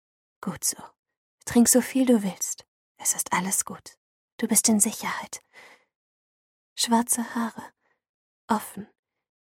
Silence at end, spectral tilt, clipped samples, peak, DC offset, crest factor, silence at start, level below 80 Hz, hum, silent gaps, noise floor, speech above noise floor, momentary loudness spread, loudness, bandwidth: 0.55 s; -3 dB/octave; under 0.1%; -6 dBFS; under 0.1%; 22 dB; 0.4 s; -64 dBFS; none; 0.99-1.03 s, 1.17-1.38 s, 2.68-2.95 s, 3.97-4.38 s, 5.96-6.76 s, 8.09-8.48 s; under -90 dBFS; over 65 dB; 20 LU; -24 LUFS; 16.5 kHz